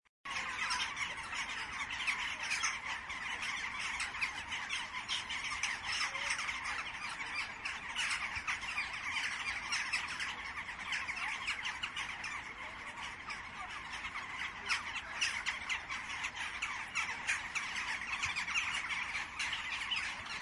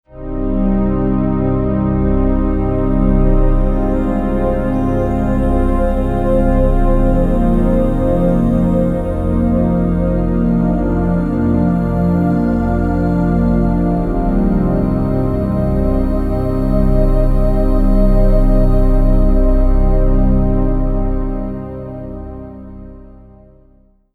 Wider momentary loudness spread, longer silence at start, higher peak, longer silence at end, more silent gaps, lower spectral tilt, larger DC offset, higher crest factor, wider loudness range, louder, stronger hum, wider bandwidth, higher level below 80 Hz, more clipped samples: about the same, 7 LU vs 5 LU; about the same, 0.25 s vs 0.15 s; second, -22 dBFS vs 0 dBFS; second, 0 s vs 1.1 s; neither; second, 0 dB/octave vs -10.5 dB/octave; neither; first, 18 dB vs 12 dB; about the same, 3 LU vs 2 LU; second, -37 LUFS vs -16 LUFS; neither; first, 12 kHz vs 3.9 kHz; second, -64 dBFS vs -16 dBFS; neither